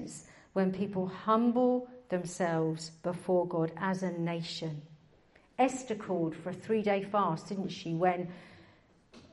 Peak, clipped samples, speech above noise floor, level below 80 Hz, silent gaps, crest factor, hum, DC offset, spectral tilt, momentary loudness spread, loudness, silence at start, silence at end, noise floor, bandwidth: -14 dBFS; under 0.1%; 32 dB; -72 dBFS; none; 20 dB; none; under 0.1%; -6 dB/octave; 10 LU; -32 LUFS; 0 s; 0.1 s; -63 dBFS; 11.5 kHz